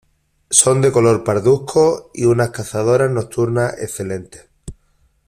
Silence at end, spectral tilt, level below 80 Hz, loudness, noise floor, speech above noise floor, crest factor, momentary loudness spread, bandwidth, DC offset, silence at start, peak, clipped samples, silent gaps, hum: 0.55 s; -5 dB/octave; -48 dBFS; -16 LUFS; -59 dBFS; 43 dB; 16 dB; 12 LU; 15.5 kHz; under 0.1%; 0.5 s; 0 dBFS; under 0.1%; none; none